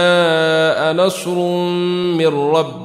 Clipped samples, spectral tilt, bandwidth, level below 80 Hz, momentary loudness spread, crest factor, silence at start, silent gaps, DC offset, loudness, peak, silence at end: under 0.1%; -5 dB/octave; 15 kHz; -62 dBFS; 4 LU; 14 dB; 0 s; none; under 0.1%; -15 LUFS; -2 dBFS; 0 s